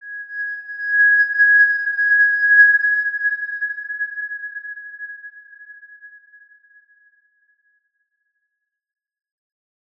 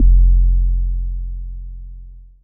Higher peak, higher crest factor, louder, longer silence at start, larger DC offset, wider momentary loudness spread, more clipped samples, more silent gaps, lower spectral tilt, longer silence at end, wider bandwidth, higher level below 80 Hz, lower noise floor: about the same, -2 dBFS vs -2 dBFS; first, 18 dB vs 12 dB; first, -15 LUFS vs -19 LUFS; about the same, 0.05 s vs 0 s; neither; about the same, 21 LU vs 22 LU; neither; neither; second, 2 dB/octave vs -20 dB/octave; first, 3.9 s vs 0.25 s; first, 5.2 kHz vs 0.3 kHz; second, -88 dBFS vs -14 dBFS; first, -78 dBFS vs -37 dBFS